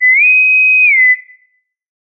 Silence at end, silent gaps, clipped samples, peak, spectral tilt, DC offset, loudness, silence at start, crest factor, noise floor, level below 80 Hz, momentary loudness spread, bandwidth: 0.95 s; none; under 0.1%; -2 dBFS; 3 dB/octave; under 0.1%; -6 LUFS; 0 s; 8 dB; -59 dBFS; under -90 dBFS; 4 LU; 4.5 kHz